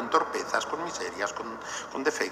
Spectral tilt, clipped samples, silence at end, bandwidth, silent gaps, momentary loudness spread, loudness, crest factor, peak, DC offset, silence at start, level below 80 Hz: -2 dB/octave; under 0.1%; 0 s; 15 kHz; none; 9 LU; -31 LUFS; 22 dB; -8 dBFS; under 0.1%; 0 s; -64 dBFS